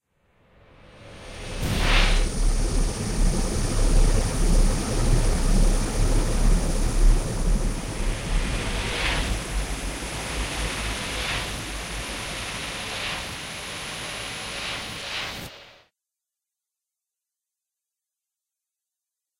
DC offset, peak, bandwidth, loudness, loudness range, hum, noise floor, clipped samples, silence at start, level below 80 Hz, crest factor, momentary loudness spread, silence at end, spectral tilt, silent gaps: under 0.1%; -6 dBFS; 15.5 kHz; -27 LUFS; 8 LU; none; -87 dBFS; under 0.1%; 0.95 s; -26 dBFS; 18 dB; 8 LU; 3.75 s; -4 dB/octave; none